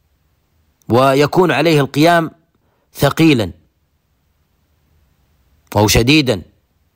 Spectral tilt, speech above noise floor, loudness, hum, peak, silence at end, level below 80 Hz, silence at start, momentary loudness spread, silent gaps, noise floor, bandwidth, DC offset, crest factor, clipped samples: -5 dB/octave; 50 dB; -13 LUFS; none; -2 dBFS; 0.5 s; -38 dBFS; 0.9 s; 9 LU; none; -62 dBFS; 16.5 kHz; under 0.1%; 14 dB; under 0.1%